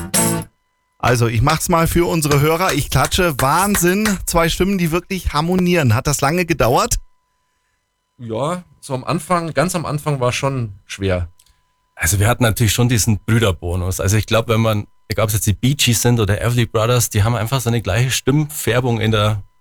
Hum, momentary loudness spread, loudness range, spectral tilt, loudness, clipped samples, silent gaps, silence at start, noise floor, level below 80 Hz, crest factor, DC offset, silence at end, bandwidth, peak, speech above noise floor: none; 7 LU; 5 LU; -4.5 dB/octave; -17 LUFS; under 0.1%; none; 0 s; -68 dBFS; -34 dBFS; 12 dB; under 0.1%; 0.15 s; over 20 kHz; -4 dBFS; 52 dB